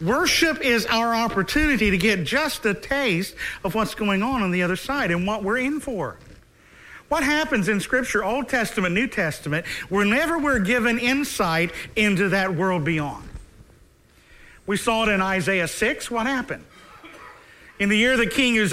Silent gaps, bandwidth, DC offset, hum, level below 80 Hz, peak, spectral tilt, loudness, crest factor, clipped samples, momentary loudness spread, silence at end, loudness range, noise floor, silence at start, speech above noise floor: none; 16 kHz; under 0.1%; none; -44 dBFS; -6 dBFS; -4.5 dB/octave; -22 LUFS; 18 dB; under 0.1%; 8 LU; 0 s; 4 LU; -54 dBFS; 0 s; 32 dB